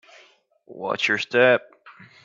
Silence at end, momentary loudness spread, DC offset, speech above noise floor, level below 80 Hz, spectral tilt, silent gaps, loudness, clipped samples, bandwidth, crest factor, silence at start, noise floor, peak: 0.2 s; 12 LU; under 0.1%; 36 dB; -74 dBFS; -4 dB/octave; none; -20 LUFS; under 0.1%; 7.6 kHz; 22 dB; 0.7 s; -57 dBFS; -2 dBFS